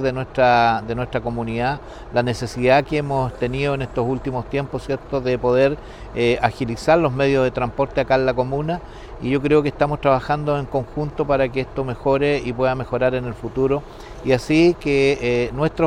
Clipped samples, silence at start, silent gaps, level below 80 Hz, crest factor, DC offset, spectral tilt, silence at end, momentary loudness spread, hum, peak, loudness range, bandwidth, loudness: under 0.1%; 0 s; none; -38 dBFS; 18 dB; under 0.1%; -7 dB/octave; 0 s; 9 LU; none; 0 dBFS; 2 LU; 12 kHz; -20 LUFS